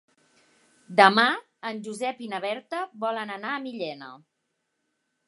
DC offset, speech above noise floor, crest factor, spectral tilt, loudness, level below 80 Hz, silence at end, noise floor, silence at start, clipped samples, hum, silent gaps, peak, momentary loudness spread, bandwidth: under 0.1%; 53 dB; 26 dB; -4 dB/octave; -25 LUFS; -84 dBFS; 1.1 s; -78 dBFS; 0.9 s; under 0.1%; none; none; -2 dBFS; 17 LU; 11.5 kHz